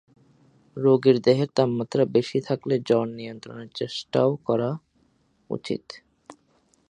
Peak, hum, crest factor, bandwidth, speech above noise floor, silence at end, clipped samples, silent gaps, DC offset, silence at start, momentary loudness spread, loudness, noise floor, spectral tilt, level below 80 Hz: -4 dBFS; none; 20 dB; 9.8 kHz; 42 dB; 0.6 s; under 0.1%; none; under 0.1%; 0.75 s; 18 LU; -24 LUFS; -65 dBFS; -7 dB/octave; -68 dBFS